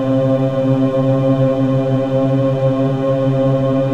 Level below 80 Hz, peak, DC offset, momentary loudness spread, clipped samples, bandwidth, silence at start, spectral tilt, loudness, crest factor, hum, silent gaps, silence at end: -46 dBFS; -2 dBFS; under 0.1%; 2 LU; under 0.1%; 6.8 kHz; 0 s; -9.5 dB/octave; -15 LUFS; 12 dB; none; none; 0 s